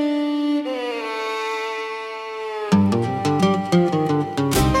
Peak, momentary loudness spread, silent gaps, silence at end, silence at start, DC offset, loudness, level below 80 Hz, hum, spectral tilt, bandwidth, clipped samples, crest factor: -6 dBFS; 10 LU; none; 0 s; 0 s; under 0.1%; -21 LUFS; -38 dBFS; none; -6 dB/octave; 17 kHz; under 0.1%; 16 dB